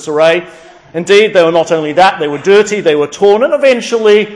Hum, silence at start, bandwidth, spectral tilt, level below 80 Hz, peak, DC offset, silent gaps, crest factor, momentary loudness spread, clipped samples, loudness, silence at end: none; 0 s; 10.5 kHz; -4 dB/octave; -54 dBFS; 0 dBFS; under 0.1%; none; 10 dB; 5 LU; 0.9%; -9 LUFS; 0 s